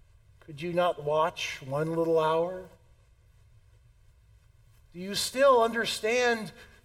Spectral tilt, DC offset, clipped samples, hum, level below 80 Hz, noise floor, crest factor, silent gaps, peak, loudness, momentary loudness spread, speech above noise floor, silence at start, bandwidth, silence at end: -4 dB/octave; under 0.1%; under 0.1%; none; -60 dBFS; -60 dBFS; 18 dB; none; -12 dBFS; -27 LUFS; 16 LU; 32 dB; 0.5 s; 16.5 kHz; 0.2 s